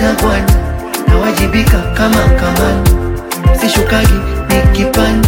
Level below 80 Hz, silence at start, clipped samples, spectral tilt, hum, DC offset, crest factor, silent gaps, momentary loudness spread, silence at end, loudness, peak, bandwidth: -14 dBFS; 0 s; under 0.1%; -5.5 dB/octave; none; under 0.1%; 10 dB; none; 5 LU; 0 s; -12 LUFS; 0 dBFS; 17 kHz